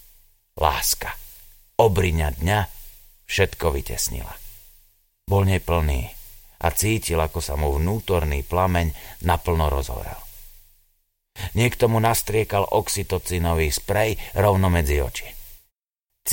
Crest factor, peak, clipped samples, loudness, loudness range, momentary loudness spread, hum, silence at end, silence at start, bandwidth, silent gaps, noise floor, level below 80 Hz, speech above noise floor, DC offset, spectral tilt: 22 dB; 0 dBFS; under 0.1%; -22 LUFS; 4 LU; 15 LU; none; 0 s; 0.55 s; 17 kHz; none; -80 dBFS; -32 dBFS; 58 dB; under 0.1%; -4.5 dB/octave